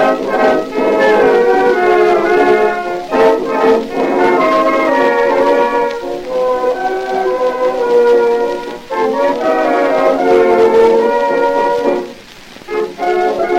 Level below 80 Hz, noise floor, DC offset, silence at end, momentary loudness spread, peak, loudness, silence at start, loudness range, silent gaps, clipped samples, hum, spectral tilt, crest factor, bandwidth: -46 dBFS; -35 dBFS; under 0.1%; 0 s; 8 LU; 0 dBFS; -12 LUFS; 0 s; 3 LU; none; under 0.1%; none; -5 dB/octave; 12 dB; 15.5 kHz